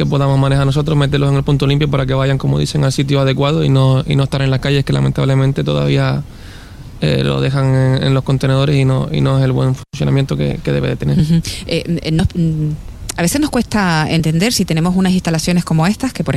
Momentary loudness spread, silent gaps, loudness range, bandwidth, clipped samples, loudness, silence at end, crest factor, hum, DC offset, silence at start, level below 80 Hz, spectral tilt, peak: 5 LU; none; 2 LU; 13 kHz; under 0.1%; -15 LUFS; 0 s; 12 dB; none; under 0.1%; 0 s; -32 dBFS; -6.5 dB/octave; -2 dBFS